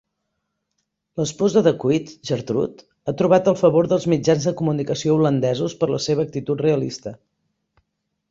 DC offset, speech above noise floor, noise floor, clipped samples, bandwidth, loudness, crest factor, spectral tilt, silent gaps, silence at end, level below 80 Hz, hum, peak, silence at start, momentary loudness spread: under 0.1%; 57 dB; -76 dBFS; under 0.1%; 7.8 kHz; -20 LUFS; 18 dB; -6.5 dB/octave; none; 1.15 s; -58 dBFS; none; -2 dBFS; 1.15 s; 11 LU